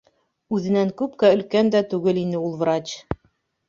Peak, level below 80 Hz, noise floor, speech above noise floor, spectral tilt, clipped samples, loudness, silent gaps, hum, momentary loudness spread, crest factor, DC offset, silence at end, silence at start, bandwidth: -4 dBFS; -52 dBFS; -66 dBFS; 45 dB; -6.5 dB/octave; under 0.1%; -21 LUFS; none; none; 13 LU; 18 dB; under 0.1%; 0.55 s; 0.5 s; 7.6 kHz